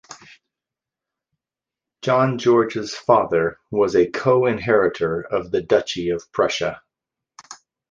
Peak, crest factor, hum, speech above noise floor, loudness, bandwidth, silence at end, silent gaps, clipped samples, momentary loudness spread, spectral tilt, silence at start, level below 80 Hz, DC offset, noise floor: -2 dBFS; 20 dB; none; 69 dB; -20 LUFS; 7.6 kHz; 0.35 s; none; under 0.1%; 7 LU; -5.5 dB/octave; 0.1 s; -54 dBFS; under 0.1%; -89 dBFS